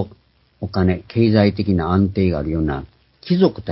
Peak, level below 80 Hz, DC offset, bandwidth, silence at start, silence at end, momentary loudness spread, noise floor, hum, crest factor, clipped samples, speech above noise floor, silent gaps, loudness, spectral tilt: 0 dBFS; -34 dBFS; under 0.1%; 5.8 kHz; 0 s; 0 s; 11 LU; -51 dBFS; none; 18 dB; under 0.1%; 34 dB; none; -18 LUFS; -12 dB/octave